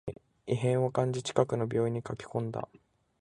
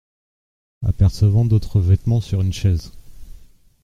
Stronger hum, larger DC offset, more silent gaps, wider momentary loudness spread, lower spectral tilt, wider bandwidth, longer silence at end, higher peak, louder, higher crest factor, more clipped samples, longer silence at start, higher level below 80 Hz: neither; neither; neither; first, 14 LU vs 9 LU; second, -6.5 dB/octave vs -8 dB/octave; about the same, 10.5 kHz vs 10 kHz; first, 0.6 s vs 0.45 s; second, -8 dBFS vs -4 dBFS; second, -31 LUFS vs -19 LUFS; first, 22 dB vs 14 dB; neither; second, 0.05 s vs 0.8 s; second, -62 dBFS vs -34 dBFS